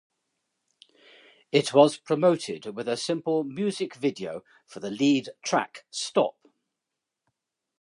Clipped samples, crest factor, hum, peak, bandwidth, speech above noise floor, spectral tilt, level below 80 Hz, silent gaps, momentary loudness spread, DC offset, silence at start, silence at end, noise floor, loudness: under 0.1%; 24 dB; none; -4 dBFS; 11.5 kHz; 60 dB; -4.5 dB/octave; -78 dBFS; none; 15 LU; under 0.1%; 1.55 s; 1.5 s; -86 dBFS; -26 LUFS